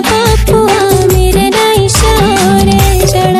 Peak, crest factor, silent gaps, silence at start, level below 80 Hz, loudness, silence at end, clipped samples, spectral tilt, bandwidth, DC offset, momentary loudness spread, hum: 0 dBFS; 8 dB; none; 0 s; -16 dBFS; -8 LUFS; 0 s; 0.5%; -4.5 dB/octave; 16.5 kHz; under 0.1%; 1 LU; none